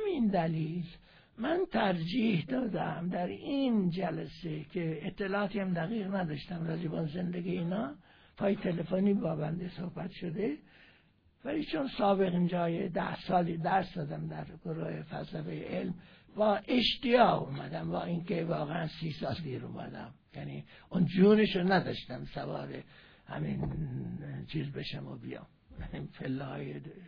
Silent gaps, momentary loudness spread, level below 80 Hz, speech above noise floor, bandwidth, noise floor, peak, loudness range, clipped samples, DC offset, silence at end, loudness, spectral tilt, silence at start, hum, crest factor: none; 15 LU; -58 dBFS; 33 dB; 5.4 kHz; -66 dBFS; -12 dBFS; 7 LU; under 0.1%; under 0.1%; 0 s; -33 LUFS; -8.5 dB/octave; 0 s; none; 22 dB